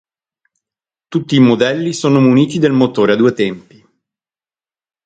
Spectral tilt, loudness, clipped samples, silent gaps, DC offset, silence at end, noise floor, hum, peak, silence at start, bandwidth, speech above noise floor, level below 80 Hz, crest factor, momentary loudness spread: -6.5 dB/octave; -13 LUFS; under 0.1%; none; under 0.1%; 1.45 s; under -90 dBFS; none; 0 dBFS; 1.1 s; 9.2 kHz; over 78 dB; -58 dBFS; 14 dB; 10 LU